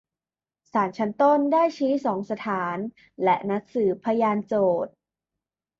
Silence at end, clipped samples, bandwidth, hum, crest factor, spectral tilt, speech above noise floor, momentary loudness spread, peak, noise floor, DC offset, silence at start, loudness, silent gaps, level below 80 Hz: 0.9 s; under 0.1%; 7.4 kHz; none; 16 dB; -7.5 dB/octave; over 67 dB; 9 LU; -8 dBFS; under -90 dBFS; under 0.1%; 0.75 s; -24 LUFS; none; -70 dBFS